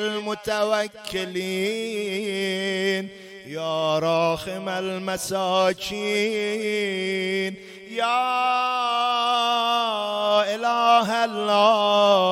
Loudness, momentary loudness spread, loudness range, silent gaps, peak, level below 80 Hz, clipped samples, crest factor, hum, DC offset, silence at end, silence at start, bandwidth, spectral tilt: -23 LUFS; 10 LU; 5 LU; none; -4 dBFS; -62 dBFS; under 0.1%; 18 dB; none; under 0.1%; 0 s; 0 s; 16 kHz; -3.5 dB/octave